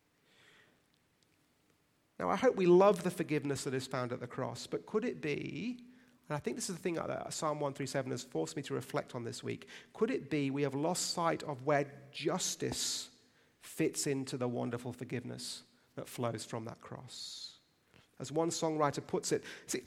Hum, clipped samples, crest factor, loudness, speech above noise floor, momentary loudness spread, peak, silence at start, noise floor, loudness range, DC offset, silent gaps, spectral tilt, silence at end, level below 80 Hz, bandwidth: none; under 0.1%; 22 dB; -36 LUFS; 38 dB; 12 LU; -14 dBFS; 2.2 s; -73 dBFS; 8 LU; under 0.1%; none; -4.5 dB/octave; 0 s; -72 dBFS; 16 kHz